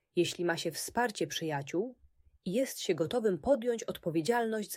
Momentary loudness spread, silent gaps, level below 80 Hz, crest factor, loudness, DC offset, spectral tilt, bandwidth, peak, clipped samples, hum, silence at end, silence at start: 6 LU; none; -66 dBFS; 16 dB; -33 LUFS; under 0.1%; -4.5 dB/octave; 16 kHz; -16 dBFS; under 0.1%; none; 0 s; 0.15 s